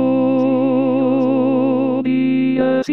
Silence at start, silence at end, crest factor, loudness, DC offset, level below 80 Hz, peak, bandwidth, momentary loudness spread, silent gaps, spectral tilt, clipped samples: 0 s; 0 s; 12 dB; -16 LUFS; 0.5%; -62 dBFS; -4 dBFS; 6 kHz; 1 LU; none; -8.5 dB/octave; under 0.1%